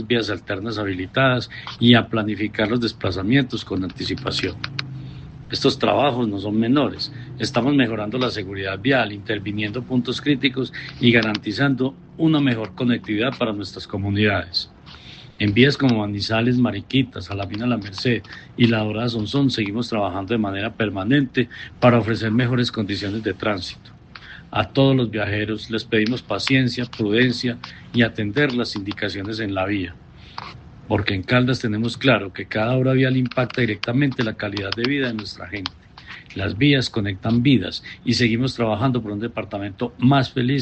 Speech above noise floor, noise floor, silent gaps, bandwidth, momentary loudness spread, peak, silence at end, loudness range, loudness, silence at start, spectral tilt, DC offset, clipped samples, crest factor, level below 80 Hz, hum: 21 dB; -42 dBFS; none; 8.6 kHz; 11 LU; 0 dBFS; 0 s; 3 LU; -21 LUFS; 0 s; -6.5 dB/octave; under 0.1%; under 0.1%; 20 dB; -50 dBFS; none